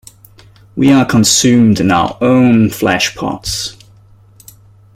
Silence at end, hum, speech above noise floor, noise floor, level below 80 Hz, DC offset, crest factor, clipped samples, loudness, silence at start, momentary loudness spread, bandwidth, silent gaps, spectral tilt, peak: 1.25 s; none; 33 dB; -43 dBFS; -42 dBFS; under 0.1%; 12 dB; under 0.1%; -11 LUFS; 0.75 s; 11 LU; 16 kHz; none; -4.5 dB/octave; 0 dBFS